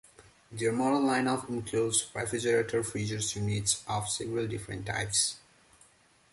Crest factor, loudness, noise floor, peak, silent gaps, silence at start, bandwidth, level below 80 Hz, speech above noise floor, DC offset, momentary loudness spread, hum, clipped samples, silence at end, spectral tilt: 22 dB; -30 LUFS; -63 dBFS; -10 dBFS; none; 0.2 s; 12 kHz; -58 dBFS; 33 dB; under 0.1%; 7 LU; none; under 0.1%; 0.95 s; -3.5 dB/octave